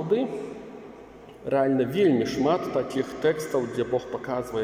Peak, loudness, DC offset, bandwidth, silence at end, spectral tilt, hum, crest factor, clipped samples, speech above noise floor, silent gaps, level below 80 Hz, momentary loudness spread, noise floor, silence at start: -10 dBFS; -26 LUFS; under 0.1%; 16 kHz; 0 s; -6.5 dB/octave; none; 16 dB; under 0.1%; 21 dB; none; -58 dBFS; 20 LU; -46 dBFS; 0 s